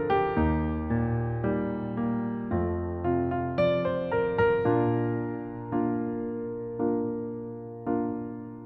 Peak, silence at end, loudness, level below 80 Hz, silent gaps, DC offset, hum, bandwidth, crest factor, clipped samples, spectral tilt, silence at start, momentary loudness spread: -12 dBFS; 0 s; -29 LUFS; -44 dBFS; none; under 0.1%; none; 5.8 kHz; 16 dB; under 0.1%; -11 dB/octave; 0 s; 9 LU